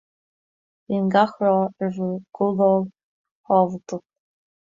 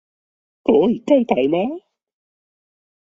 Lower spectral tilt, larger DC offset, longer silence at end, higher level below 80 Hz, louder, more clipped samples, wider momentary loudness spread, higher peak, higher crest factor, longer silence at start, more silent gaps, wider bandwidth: about the same, -8 dB/octave vs -7.5 dB/octave; neither; second, 0.7 s vs 1.35 s; second, -68 dBFS vs -60 dBFS; second, -21 LUFS vs -18 LUFS; neither; first, 14 LU vs 10 LU; about the same, -4 dBFS vs -2 dBFS; about the same, 18 dB vs 18 dB; first, 0.9 s vs 0.65 s; first, 3.03-3.24 s, 3.31-3.44 s vs none; about the same, 7.4 kHz vs 7.6 kHz